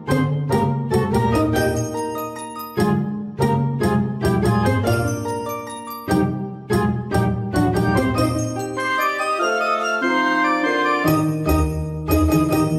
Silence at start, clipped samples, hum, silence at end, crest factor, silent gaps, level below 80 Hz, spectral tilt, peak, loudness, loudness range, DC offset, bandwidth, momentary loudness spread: 0 s; under 0.1%; none; 0 s; 14 dB; none; -34 dBFS; -6.5 dB/octave; -6 dBFS; -20 LUFS; 2 LU; under 0.1%; 16 kHz; 8 LU